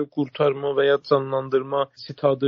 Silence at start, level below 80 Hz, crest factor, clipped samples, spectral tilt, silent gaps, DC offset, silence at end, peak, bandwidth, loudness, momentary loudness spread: 0 s; -70 dBFS; 16 dB; under 0.1%; -4.5 dB/octave; none; under 0.1%; 0 s; -6 dBFS; 6 kHz; -23 LUFS; 6 LU